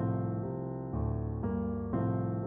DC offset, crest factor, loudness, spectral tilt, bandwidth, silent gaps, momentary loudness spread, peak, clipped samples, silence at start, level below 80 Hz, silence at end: under 0.1%; 12 dB; -35 LUFS; -12 dB/octave; 2.3 kHz; none; 5 LU; -22 dBFS; under 0.1%; 0 s; -46 dBFS; 0 s